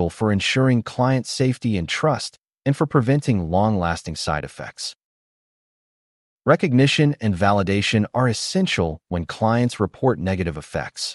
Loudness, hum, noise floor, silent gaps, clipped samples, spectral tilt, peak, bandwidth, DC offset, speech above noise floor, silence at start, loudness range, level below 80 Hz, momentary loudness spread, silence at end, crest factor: -21 LUFS; none; under -90 dBFS; 2.38-2.42 s, 5.04-6.37 s; under 0.1%; -5.5 dB/octave; -4 dBFS; 11.5 kHz; under 0.1%; over 70 dB; 0 s; 5 LU; -46 dBFS; 10 LU; 0 s; 16 dB